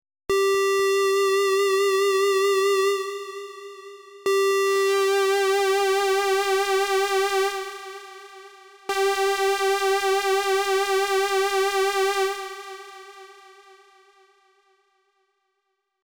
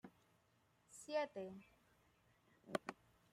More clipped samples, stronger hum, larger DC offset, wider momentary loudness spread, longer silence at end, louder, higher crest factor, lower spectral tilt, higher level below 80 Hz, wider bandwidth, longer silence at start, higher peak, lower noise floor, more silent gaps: neither; neither; neither; about the same, 18 LU vs 20 LU; first, 2.7 s vs 0.4 s; first, -22 LUFS vs -47 LUFS; second, 10 dB vs 28 dB; second, -0.5 dB/octave vs -4 dB/octave; first, -64 dBFS vs -86 dBFS; first, over 20 kHz vs 15.5 kHz; first, 0.3 s vs 0.05 s; first, -14 dBFS vs -22 dBFS; about the same, -76 dBFS vs -78 dBFS; neither